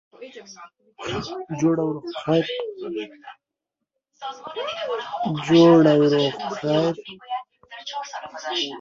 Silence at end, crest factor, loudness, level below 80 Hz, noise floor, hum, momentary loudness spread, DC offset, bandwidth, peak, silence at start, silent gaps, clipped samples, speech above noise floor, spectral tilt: 0 s; 20 dB; -22 LUFS; -62 dBFS; -83 dBFS; none; 21 LU; under 0.1%; 7.4 kHz; -4 dBFS; 0.2 s; none; under 0.1%; 61 dB; -6 dB/octave